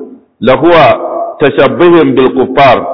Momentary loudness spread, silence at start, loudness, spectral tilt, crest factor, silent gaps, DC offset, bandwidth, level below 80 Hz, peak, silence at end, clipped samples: 7 LU; 0 s; -7 LUFS; -8 dB/octave; 6 dB; none; under 0.1%; 5.4 kHz; -38 dBFS; 0 dBFS; 0 s; 3%